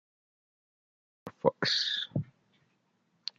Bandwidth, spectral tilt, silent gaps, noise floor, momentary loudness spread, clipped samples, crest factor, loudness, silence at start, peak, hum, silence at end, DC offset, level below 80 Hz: 12 kHz; -4 dB/octave; none; -74 dBFS; 22 LU; under 0.1%; 28 dB; -30 LUFS; 1.25 s; -8 dBFS; none; 1.15 s; under 0.1%; -72 dBFS